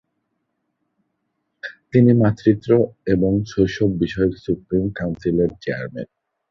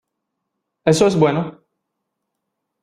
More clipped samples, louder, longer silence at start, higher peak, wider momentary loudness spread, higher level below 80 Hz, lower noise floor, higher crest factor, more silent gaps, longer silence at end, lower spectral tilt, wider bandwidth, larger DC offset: neither; about the same, -19 LUFS vs -17 LUFS; first, 1.65 s vs 0.85 s; about the same, -2 dBFS vs -2 dBFS; first, 17 LU vs 11 LU; first, -44 dBFS vs -56 dBFS; second, -74 dBFS vs -78 dBFS; about the same, 18 dB vs 20 dB; neither; second, 0.45 s vs 1.3 s; first, -8.5 dB/octave vs -6 dB/octave; second, 7 kHz vs 14.5 kHz; neither